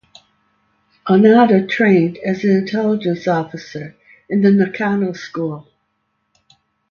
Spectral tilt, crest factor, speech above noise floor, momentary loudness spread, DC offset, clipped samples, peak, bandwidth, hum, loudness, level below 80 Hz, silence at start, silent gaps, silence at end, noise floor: -8 dB/octave; 16 dB; 54 dB; 19 LU; under 0.1%; under 0.1%; 0 dBFS; 6.8 kHz; none; -15 LUFS; -62 dBFS; 1.05 s; none; 1.3 s; -69 dBFS